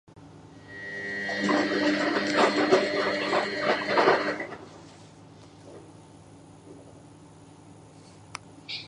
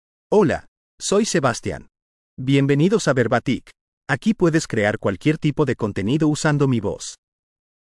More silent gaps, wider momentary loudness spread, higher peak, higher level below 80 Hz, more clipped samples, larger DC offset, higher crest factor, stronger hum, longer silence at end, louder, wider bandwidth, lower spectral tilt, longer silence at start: second, none vs 0.68-0.98 s, 2.02-2.37 s, 3.81-4.01 s; first, 25 LU vs 11 LU; about the same, -6 dBFS vs -4 dBFS; second, -66 dBFS vs -50 dBFS; neither; neither; first, 22 dB vs 16 dB; neither; second, 0 s vs 0.75 s; second, -25 LUFS vs -20 LUFS; about the same, 11 kHz vs 12 kHz; second, -4 dB/octave vs -5.5 dB/octave; second, 0.15 s vs 0.3 s